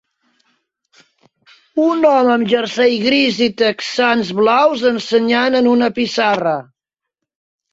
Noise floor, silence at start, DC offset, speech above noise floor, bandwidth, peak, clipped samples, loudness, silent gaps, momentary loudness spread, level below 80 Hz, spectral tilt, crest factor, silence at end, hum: -83 dBFS; 1.75 s; under 0.1%; 69 dB; 8 kHz; -2 dBFS; under 0.1%; -14 LUFS; none; 5 LU; -60 dBFS; -4.5 dB/octave; 14 dB; 1.1 s; none